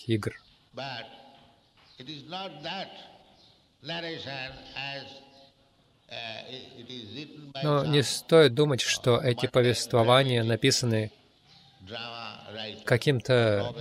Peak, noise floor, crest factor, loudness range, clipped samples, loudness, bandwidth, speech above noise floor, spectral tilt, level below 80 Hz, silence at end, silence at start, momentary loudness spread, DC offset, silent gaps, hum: -6 dBFS; -64 dBFS; 22 dB; 16 LU; under 0.1%; -26 LUFS; 15.5 kHz; 37 dB; -5 dB/octave; -64 dBFS; 0 s; 0 s; 20 LU; under 0.1%; none; none